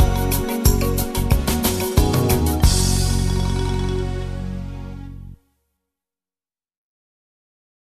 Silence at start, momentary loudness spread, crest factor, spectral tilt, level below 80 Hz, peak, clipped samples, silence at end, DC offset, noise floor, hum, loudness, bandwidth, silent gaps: 0 s; 15 LU; 20 dB; -5 dB/octave; -24 dBFS; -2 dBFS; under 0.1%; 2.55 s; under 0.1%; under -90 dBFS; none; -20 LUFS; 14 kHz; none